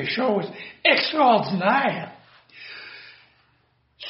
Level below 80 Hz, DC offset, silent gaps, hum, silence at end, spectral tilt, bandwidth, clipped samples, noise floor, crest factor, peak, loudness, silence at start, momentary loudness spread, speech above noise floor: -70 dBFS; under 0.1%; none; none; 0 s; -2 dB/octave; 5.8 kHz; under 0.1%; -65 dBFS; 24 dB; 0 dBFS; -21 LUFS; 0 s; 22 LU; 43 dB